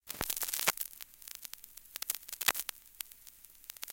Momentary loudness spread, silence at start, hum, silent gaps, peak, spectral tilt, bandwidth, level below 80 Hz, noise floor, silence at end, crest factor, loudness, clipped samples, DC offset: 17 LU; 0.05 s; none; none; -8 dBFS; 0.5 dB/octave; 17 kHz; -64 dBFS; -57 dBFS; 0 s; 30 dB; -36 LUFS; under 0.1%; under 0.1%